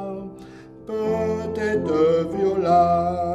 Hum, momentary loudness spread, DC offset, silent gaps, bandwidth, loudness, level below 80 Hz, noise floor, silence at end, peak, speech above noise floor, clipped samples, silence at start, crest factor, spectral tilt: none; 18 LU; under 0.1%; none; 11 kHz; -21 LUFS; -50 dBFS; -42 dBFS; 0 s; -8 dBFS; 22 dB; under 0.1%; 0 s; 14 dB; -7.5 dB/octave